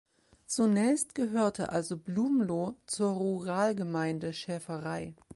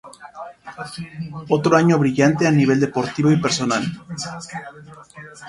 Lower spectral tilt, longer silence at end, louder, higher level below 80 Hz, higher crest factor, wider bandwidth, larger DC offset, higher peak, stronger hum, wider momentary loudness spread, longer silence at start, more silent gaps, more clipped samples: about the same, -5.5 dB/octave vs -6 dB/octave; about the same, 0 s vs 0 s; second, -31 LUFS vs -18 LUFS; second, -68 dBFS vs -56 dBFS; about the same, 16 dB vs 20 dB; about the same, 11.5 kHz vs 11.5 kHz; neither; second, -16 dBFS vs 0 dBFS; neither; second, 9 LU vs 21 LU; first, 0.5 s vs 0.05 s; neither; neither